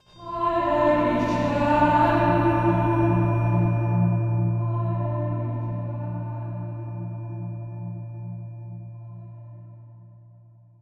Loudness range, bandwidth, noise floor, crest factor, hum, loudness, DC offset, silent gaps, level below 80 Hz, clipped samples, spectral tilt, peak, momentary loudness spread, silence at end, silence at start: 16 LU; 6.4 kHz; -51 dBFS; 18 dB; none; -24 LUFS; under 0.1%; none; -46 dBFS; under 0.1%; -9 dB/octave; -8 dBFS; 19 LU; 0.6 s; 0.15 s